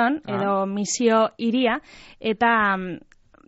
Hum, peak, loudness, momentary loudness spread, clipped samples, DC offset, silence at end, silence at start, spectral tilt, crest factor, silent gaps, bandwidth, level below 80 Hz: none; -6 dBFS; -22 LUFS; 11 LU; under 0.1%; under 0.1%; 0.5 s; 0 s; -3.5 dB/octave; 16 dB; none; 8 kHz; -58 dBFS